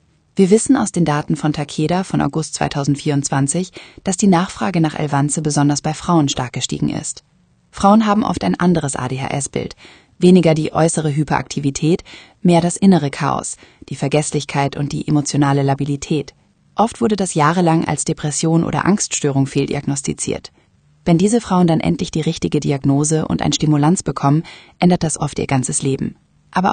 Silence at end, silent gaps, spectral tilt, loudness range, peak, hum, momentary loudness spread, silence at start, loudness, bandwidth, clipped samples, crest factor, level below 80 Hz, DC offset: 0 s; none; -5.5 dB/octave; 2 LU; 0 dBFS; none; 9 LU; 0.35 s; -17 LUFS; 10 kHz; under 0.1%; 16 dB; -46 dBFS; under 0.1%